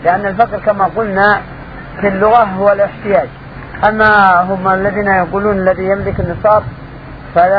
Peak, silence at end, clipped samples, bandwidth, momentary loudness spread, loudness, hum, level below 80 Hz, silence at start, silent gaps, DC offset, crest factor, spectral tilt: 0 dBFS; 0 s; 0.1%; 5.4 kHz; 19 LU; -12 LUFS; none; -34 dBFS; 0 s; none; 0.2%; 12 dB; -9 dB/octave